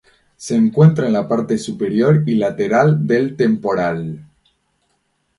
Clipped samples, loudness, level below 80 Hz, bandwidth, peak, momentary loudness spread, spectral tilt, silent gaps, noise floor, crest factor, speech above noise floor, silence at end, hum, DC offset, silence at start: under 0.1%; -16 LUFS; -56 dBFS; 11.5 kHz; 0 dBFS; 9 LU; -7.5 dB/octave; none; -66 dBFS; 16 dB; 51 dB; 1.15 s; none; under 0.1%; 0.4 s